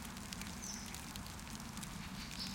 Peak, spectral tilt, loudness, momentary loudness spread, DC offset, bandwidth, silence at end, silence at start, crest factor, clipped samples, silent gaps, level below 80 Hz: -22 dBFS; -3 dB/octave; -46 LUFS; 3 LU; under 0.1%; 17 kHz; 0 s; 0 s; 24 dB; under 0.1%; none; -56 dBFS